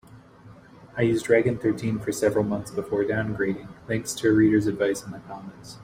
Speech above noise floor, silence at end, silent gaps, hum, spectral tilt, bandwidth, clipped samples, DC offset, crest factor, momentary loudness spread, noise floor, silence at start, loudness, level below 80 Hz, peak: 25 dB; 0 s; none; none; -6 dB/octave; 16 kHz; under 0.1%; under 0.1%; 18 dB; 17 LU; -49 dBFS; 0.1 s; -24 LUFS; -56 dBFS; -6 dBFS